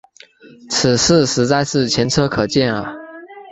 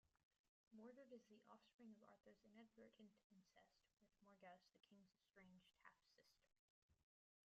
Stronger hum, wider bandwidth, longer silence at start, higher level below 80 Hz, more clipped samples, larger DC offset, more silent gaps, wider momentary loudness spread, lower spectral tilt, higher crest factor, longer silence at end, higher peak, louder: neither; first, 8.4 kHz vs 7.2 kHz; first, 0.65 s vs 0.05 s; first, -44 dBFS vs under -90 dBFS; neither; neither; second, none vs 0.23-0.31 s, 0.39-0.67 s, 1.74-1.79 s, 3.24-3.30 s, 6.59-6.89 s; first, 18 LU vs 4 LU; about the same, -4 dB/octave vs -4 dB/octave; about the same, 18 dB vs 20 dB; second, 0 s vs 0.45 s; first, 0 dBFS vs -50 dBFS; first, -16 LUFS vs -68 LUFS